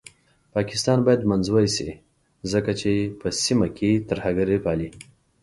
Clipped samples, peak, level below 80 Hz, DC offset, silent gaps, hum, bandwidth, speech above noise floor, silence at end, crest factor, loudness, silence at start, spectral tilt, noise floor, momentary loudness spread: under 0.1%; -6 dBFS; -48 dBFS; under 0.1%; none; none; 11.5 kHz; 29 dB; 0.4 s; 18 dB; -23 LUFS; 0.55 s; -5.5 dB/octave; -51 dBFS; 9 LU